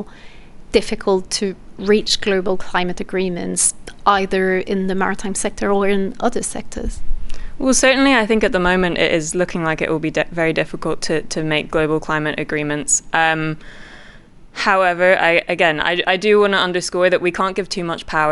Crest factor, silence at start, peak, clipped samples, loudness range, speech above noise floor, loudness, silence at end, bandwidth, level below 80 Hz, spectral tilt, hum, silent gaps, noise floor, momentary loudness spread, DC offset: 16 dB; 0 s; -2 dBFS; under 0.1%; 4 LU; 24 dB; -17 LUFS; 0 s; 12 kHz; -34 dBFS; -3.5 dB/octave; none; none; -41 dBFS; 10 LU; under 0.1%